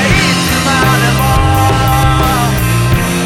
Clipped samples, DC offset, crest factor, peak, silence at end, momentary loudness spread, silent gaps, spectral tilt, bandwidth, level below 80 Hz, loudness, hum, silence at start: under 0.1%; under 0.1%; 10 dB; 0 dBFS; 0 s; 2 LU; none; -4.5 dB/octave; 18.5 kHz; -20 dBFS; -10 LUFS; none; 0 s